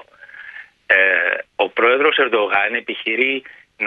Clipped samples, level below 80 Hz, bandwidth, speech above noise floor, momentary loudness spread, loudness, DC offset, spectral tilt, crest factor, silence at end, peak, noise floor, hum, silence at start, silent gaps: under 0.1%; -70 dBFS; 4.9 kHz; 22 dB; 21 LU; -16 LUFS; under 0.1%; -4.5 dB/octave; 18 dB; 0 s; 0 dBFS; -40 dBFS; none; 0.35 s; none